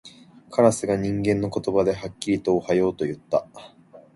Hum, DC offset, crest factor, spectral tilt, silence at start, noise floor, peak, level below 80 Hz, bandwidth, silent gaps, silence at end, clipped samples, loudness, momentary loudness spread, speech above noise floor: none; under 0.1%; 20 dB; -6 dB/octave; 0.05 s; -47 dBFS; -4 dBFS; -52 dBFS; 11.5 kHz; none; 0.15 s; under 0.1%; -23 LUFS; 8 LU; 24 dB